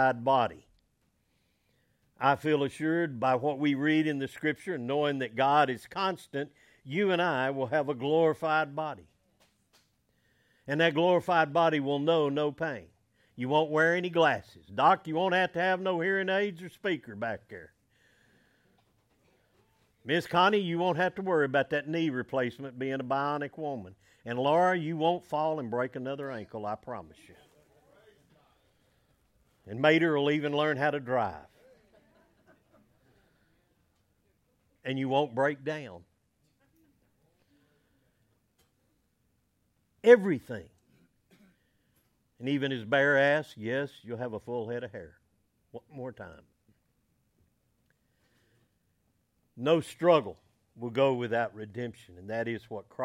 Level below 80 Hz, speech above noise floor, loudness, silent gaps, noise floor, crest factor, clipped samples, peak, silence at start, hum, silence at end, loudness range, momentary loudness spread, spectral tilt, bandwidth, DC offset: -72 dBFS; 45 dB; -29 LUFS; none; -74 dBFS; 26 dB; under 0.1%; -6 dBFS; 0 s; none; 0 s; 12 LU; 16 LU; -6.5 dB/octave; 13.5 kHz; under 0.1%